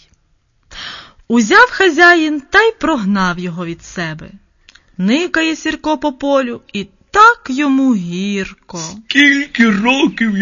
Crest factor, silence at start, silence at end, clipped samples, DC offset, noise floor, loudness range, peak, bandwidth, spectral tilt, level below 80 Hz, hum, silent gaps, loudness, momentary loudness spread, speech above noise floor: 14 dB; 0.75 s; 0 s; under 0.1%; under 0.1%; -58 dBFS; 6 LU; 0 dBFS; 7.4 kHz; -4.5 dB/octave; -46 dBFS; none; none; -12 LUFS; 17 LU; 45 dB